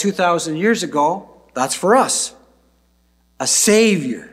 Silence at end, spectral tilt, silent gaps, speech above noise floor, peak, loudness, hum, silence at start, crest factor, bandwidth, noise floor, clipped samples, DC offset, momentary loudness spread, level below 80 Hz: 0.05 s; -3 dB/octave; none; 42 dB; -2 dBFS; -16 LUFS; none; 0 s; 16 dB; 16 kHz; -59 dBFS; under 0.1%; under 0.1%; 11 LU; -60 dBFS